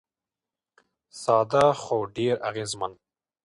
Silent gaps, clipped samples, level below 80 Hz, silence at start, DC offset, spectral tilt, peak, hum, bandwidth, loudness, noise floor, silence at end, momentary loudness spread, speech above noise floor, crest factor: none; under 0.1%; -64 dBFS; 1.15 s; under 0.1%; -5 dB/octave; -6 dBFS; none; 11.5 kHz; -25 LUFS; under -90 dBFS; 0.5 s; 12 LU; over 66 dB; 20 dB